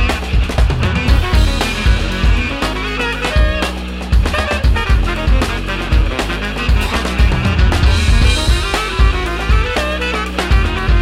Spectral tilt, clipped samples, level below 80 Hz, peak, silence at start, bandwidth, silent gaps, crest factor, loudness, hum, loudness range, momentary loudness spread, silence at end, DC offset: -5 dB/octave; under 0.1%; -16 dBFS; 0 dBFS; 0 s; 13.5 kHz; none; 14 dB; -15 LUFS; none; 2 LU; 5 LU; 0 s; under 0.1%